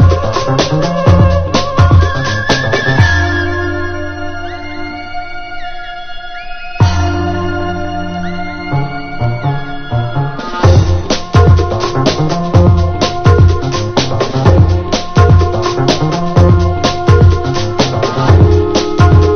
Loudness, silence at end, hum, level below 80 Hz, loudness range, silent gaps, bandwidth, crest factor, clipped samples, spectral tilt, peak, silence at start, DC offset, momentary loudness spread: -12 LUFS; 0 s; none; -18 dBFS; 8 LU; none; 6.8 kHz; 10 dB; 0.6%; -6.5 dB/octave; 0 dBFS; 0 s; under 0.1%; 15 LU